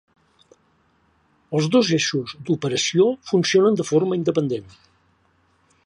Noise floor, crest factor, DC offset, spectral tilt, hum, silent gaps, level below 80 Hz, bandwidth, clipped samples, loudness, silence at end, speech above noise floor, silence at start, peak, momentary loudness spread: -62 dBFS; 16 dB; under 0.1%; -5 dB/octave; none; none; -64 dBFS; 11 kHz; under 0.1%; -20 LUFS; 1.25 s; 43 dB; 1.5 s; -6 dBFS; 9 LU